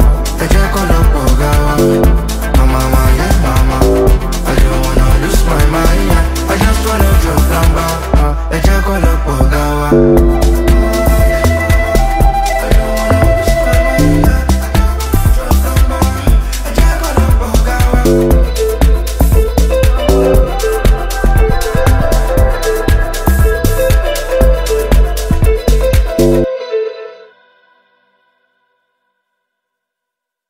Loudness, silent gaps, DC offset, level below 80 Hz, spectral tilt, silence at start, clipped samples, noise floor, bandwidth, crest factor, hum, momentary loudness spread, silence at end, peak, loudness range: -12 LUFS; none; under 0.1%; -12 dBFS; -6 dB/octave; 0 s; under 0.1%; -79 dBFS; 16.5 kHz; 10 dB; none; 4 LU; 3.35 s; 0 dBFS; 2 LU